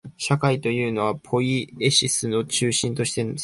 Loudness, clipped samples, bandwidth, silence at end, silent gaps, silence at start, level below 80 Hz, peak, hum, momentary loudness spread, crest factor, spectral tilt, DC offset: -22 LUFS; under 0.1%; 11.5 kHz; 0 s; none; 0.05 s; -56 dBFS; -6 dBFS; none; 6 LU; 18 dB; -4 dB/octave; under 0.1%